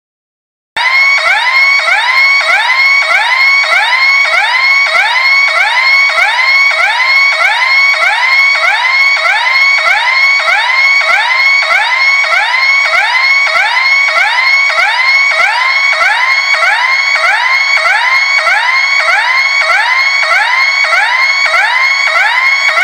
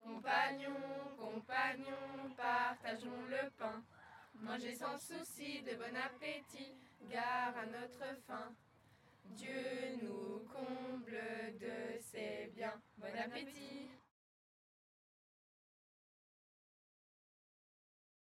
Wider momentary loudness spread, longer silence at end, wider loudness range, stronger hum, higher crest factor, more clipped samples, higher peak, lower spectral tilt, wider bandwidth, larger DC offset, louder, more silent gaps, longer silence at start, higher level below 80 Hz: second, 2 LU vs 14 LU; second, 0 s vs 4.25 s; second, 1 LU vs 8 LU; neither; second, 8 dB vs 24 dB; first, 0.2% vs under 0.1%; first, 0 dBFS vs -22 dBFS; second, 3.5 dB/octave vs -3.5 dB/octave; first, 19.5 kHz vs 16 kHz; neither; first, -6 LUFS vs -45 LUFS; neither; first, 0.75 s vs 0 s; first, -62 dBFS vs -88 dBFS